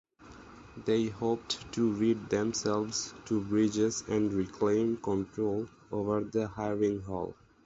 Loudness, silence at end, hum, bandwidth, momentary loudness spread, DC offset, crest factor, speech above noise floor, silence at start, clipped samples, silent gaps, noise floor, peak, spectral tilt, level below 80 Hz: -32 LUFS; 0.35 s; none; 8 kHz; 9 LU; under 0.1%; 16 dB; 22 dB; 0.2 s; under 0.1%; none; -52 dBFS; -16 dBFS; -5 dB/octave; -60 dBFS